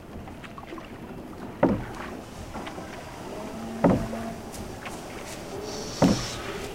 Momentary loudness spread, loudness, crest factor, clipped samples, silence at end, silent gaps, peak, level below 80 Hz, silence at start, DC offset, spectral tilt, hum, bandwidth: 16 LU; -30 LUFS; 24 dB; under 0.1%; 0 s; none; -6 dBFS; -46 dBFS; 0 s; under 0.1%; -5.5 dB/octave; none; 16 kHz